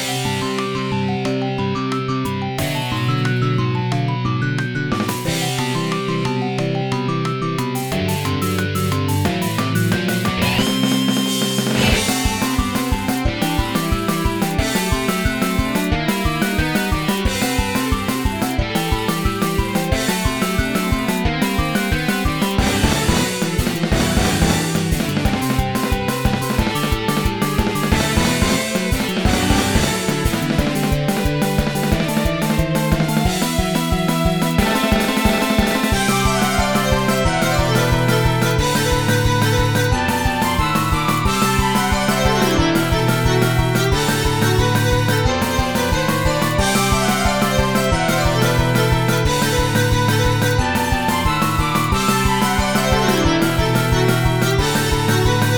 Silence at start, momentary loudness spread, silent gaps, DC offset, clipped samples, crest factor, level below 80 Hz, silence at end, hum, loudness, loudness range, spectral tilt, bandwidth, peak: 0 s; 4 LU; none; 0.5%; under 0.1%; 16 dB; -28 dBFS; 0 s; none; -18 LUFS; 4 LU; -4.5 dB/octave; over 20 kHz; 0 dBFS